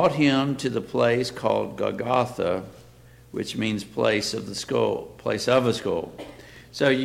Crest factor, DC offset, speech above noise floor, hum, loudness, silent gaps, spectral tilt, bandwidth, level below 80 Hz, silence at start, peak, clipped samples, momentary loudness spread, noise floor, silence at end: 18 dB; under 0.1%; 26 dB; none; -25 LUFS; none; -5 dB/octave; 16 kHz; -56 dBFS; 0 s; -8 dBFS; under 0.1%; 14 LU; -50 dBFS; 0 s